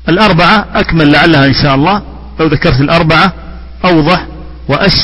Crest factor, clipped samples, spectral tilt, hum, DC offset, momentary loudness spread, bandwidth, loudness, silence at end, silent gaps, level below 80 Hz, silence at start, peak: 8 dB; 0.7%; -7 dB/octave; none; under 0.1%; 10 LU; 11 kHz; -8 LUFS; 0 s; none; -24 dBFS; 0 s; 0 dBFS